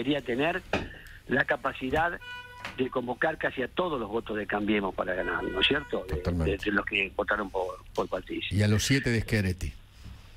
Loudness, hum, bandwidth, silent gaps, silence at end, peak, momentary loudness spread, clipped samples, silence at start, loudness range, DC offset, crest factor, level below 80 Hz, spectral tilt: -29 LUFS; none; 16 kHz; none; 0 s; -12 dBFS; 9 LU; under 0.1%; 0 s; 2 LU; under 0.1%; 18 dB; -44 dBFS; -5 dB/octave